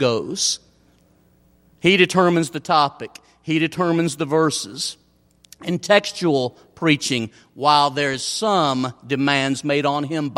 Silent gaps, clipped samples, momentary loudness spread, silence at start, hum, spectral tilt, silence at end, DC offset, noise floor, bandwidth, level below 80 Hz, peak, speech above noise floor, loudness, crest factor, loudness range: none; under 0.1%; 11 LU; 0 s; none; -4 dB/octave; 0 s; under 0.1%; -57 dBFS; 16 kHz; -62 dBFS; -2 dBFS; 37 dB; -20 LUFS; 20 dB; 3 LU